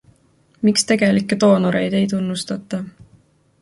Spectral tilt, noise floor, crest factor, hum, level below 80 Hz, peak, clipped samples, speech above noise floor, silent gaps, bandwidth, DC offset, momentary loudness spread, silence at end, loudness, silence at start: -5 dB/octave; -57 dBFS; 16 dB; none; -56 dBFS; -2 dBFS; under 0.1%; 39 dB; none; 11.5 kHz; under 0.1%; 12 LU; 0.7 s; -18 LUFS; 0.6 s